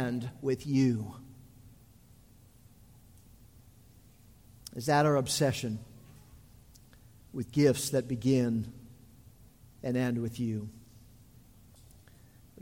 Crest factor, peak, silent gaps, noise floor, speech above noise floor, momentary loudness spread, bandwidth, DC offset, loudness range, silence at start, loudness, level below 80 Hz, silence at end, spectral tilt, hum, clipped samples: 20 dB; -12 dBFS; none; -58 dBFS; 29 dB; 19 LU; 16.5 kHz; under 0.1%; 7 LU; 0 s; -31 LUFS; -60 dBFS; 1.8 s; -5.5 dB/octave; none; under 0.1%